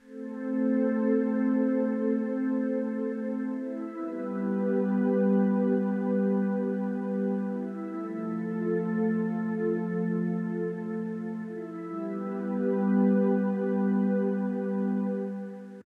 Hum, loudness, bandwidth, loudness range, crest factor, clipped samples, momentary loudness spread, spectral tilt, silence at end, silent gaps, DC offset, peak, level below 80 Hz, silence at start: none; -29 LUFS; 3.4 kHz; 3 LU; 14 dB; under 0.1%; 10 LU; -11 dB/octave; 0.2 s; none; under 0.1%; -14 dBFS; -84 dBFS; 0.05 s